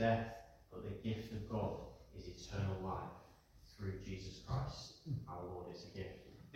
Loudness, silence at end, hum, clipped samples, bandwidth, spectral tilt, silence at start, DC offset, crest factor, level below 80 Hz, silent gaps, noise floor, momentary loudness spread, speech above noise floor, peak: -46 LUFS; 0 s; none; under 0.1%; 16 kHz; -6.5 dB/octave; 0 s; under 0.1%; 20 dB; -60 dBFS; none; -64 dBFS; 14 LU; 21 dB; -24 dBFS